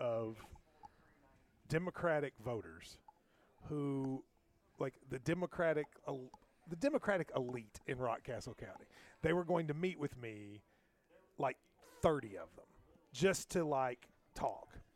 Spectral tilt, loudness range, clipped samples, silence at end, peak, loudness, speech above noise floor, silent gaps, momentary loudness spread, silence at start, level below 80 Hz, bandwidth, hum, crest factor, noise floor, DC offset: -6 dB/octave; 4 LU; under 0.1%; 0.15 s; -18 dBFS; -40 LUFS; 32 dB; none; 20 LU; 0 s; -66 dBFS; 16.5 kHz; none; 24 dB; -72 dBFS; under 0.1%